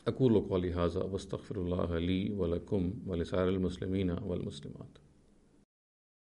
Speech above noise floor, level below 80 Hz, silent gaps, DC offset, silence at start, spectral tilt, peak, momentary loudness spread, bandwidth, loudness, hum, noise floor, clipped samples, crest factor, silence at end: 31 dB; -52 dBFS; none; under 0.1%; 0.05 s; -8 dB/octave; -16 dBFS; 11 LU; 10.5 kHz; -34 LUFS; none; -64 dBFS; under 0.1%; 18 dB; 1.35 s